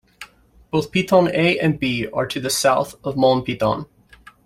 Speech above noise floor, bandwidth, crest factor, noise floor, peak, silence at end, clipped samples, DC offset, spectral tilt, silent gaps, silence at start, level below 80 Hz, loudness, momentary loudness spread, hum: 30 dB; 16 kHz; 18 dB; -49 dBFS; -2 dBFS; 0.6 s; under 0.1%; under 0.1%; -5 dB/octave; none; 0.2 s; -50 dBFS; -19 LUFS; 8 LU; none